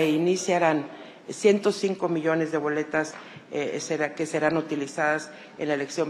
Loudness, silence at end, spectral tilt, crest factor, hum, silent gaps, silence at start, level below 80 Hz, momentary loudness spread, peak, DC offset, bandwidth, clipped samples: -26 LUFS; 0 s; -5 dB/octave; 18 dB; none; none; 0 s; -72 dBFS; 12 LU; -8 dBFS; under 0.1%; 14 kHz; under 0.1%